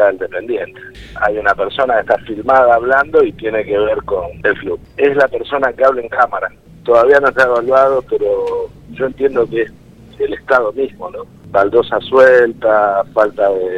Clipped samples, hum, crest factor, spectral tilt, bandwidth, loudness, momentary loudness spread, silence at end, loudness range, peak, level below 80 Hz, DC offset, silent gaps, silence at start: under 0.1%; none; 14 dB; -6 dB/octave; 8.6 kHz; -14 LUFS; 12 LU; 0 s; 4 LU; 0 dBFS; -44 dBFS; under 0.1%; none; 0 s